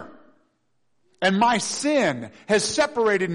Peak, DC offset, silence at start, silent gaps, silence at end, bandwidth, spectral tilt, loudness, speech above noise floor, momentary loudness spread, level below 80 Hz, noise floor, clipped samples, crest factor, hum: -8 dBFS; under 0.1%; 0 s; none; 0 s; 10.5 kHz; -3.5 dB/octave; -22 LUFS; 51 dB; 5 LU; -62 dBFS; -72 dBFS; under 0.1%; 14 dB; none